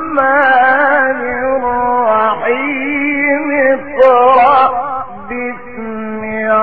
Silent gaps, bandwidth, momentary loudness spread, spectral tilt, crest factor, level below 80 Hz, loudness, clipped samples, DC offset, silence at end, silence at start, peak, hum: none; 4.9 kHz; 14 LU; -7.5 dB/octave; 12 dB; -46 dBFS; -12 LUFS; under 0.1%; 2%; 0 s; 0 s; 0 dBFS; none